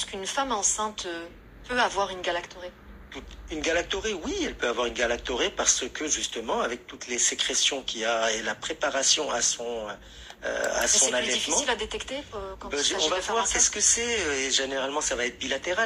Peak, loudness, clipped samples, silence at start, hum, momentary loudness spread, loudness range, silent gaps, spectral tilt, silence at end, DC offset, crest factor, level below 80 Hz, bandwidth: -8 dBFS; -25 LUFS; under 0.1%; 0 s; none; 15 LU; 6 LU; none; -0.5 dB/octave; 0 s; under 0.1%; 20 dB; -50 dBFS; 15.5 kHz